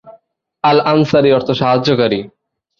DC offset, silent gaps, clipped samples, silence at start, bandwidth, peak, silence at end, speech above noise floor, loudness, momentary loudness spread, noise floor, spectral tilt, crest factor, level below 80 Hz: under 0.1%; none; under 0.1%; 0.05 s; 7.2 kHz; -2 dBFS; 0.55 s; 37 dB; -13 LUFS; 6 LU; -49 dBFS; -7 dB/octave; 14 dB; -52 dBFS